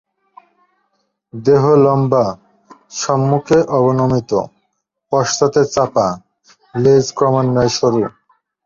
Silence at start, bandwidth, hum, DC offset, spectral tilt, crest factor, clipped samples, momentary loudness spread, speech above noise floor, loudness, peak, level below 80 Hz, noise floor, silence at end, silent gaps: 1.35 s; 7.6 kHz; none; under 0.1%; -6 dB/octave; 16 dB; under 0.1%; 12 LU; 56 dB; -15 LUFS; 0 dBFS; -50 dBFS; -70 dBFS; 0.55 s; none